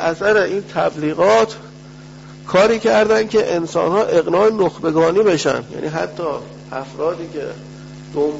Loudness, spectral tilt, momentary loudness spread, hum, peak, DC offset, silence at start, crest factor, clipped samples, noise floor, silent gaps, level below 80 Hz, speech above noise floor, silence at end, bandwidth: -17 LUFS; -5 dB/octave; 16 LU; none; -2 dBFS; under 0.1%; 0 s; 14 dB; under 0.1%; -37 dBFS; none; -50 dBFS; 21 dB; 0 s; 8 kHz